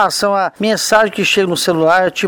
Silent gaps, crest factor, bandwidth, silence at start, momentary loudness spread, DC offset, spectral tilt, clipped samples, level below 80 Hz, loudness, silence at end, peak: none; 14 dB; over 20 kHz; 0 s; 4 LU; under 0.1%; -3 dB/octave; under 0.1%; -54 dBFS; -13 LUFS; 0 s; 0 dBFS